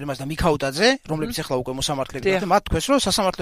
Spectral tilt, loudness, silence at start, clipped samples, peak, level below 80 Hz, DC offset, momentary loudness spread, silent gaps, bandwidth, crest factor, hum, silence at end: -4 dB/octave; -21 LUFS; 0 s; under 0.1%; -4 dBFS; -38 dBFS; under 0.1%; 7 LU; none; 16 kHz; 18 dB; none; 0 s